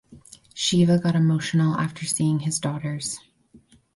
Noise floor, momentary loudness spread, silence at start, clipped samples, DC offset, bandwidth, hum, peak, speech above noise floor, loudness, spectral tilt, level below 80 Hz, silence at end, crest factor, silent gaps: -55 dBFS; 11 LU; 0.1 s; under 0.1%; under 0.1%; 11.5 kHz; none; -8 dBFS; 33 dB; -23 LUFS; -5 dB/octave; -58 dBFS; 0.4 s; 14 dB; none